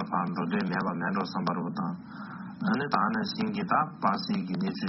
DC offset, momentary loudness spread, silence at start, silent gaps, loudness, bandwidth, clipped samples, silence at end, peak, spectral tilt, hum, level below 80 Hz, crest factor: under 0.1%; 8 LU; 0 s; none; -30 LUFS; 6 kHz; under 0.1%; 0 s; -8 dBFS; -5 dB/octave; none; -68 dBFS; 20 dB